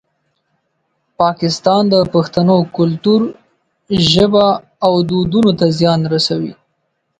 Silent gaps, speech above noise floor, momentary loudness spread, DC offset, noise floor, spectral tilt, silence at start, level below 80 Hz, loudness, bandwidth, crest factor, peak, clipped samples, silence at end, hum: none; 55 dB; 6 LU; under 0.1%; -67 dBFS; -6.5 dB/octave; 1.2 s; -46 dBFS; -13 LUFS; 9.2 kHz; 14 dB; 0 dBFS; under 0.1%; 0.7 s; none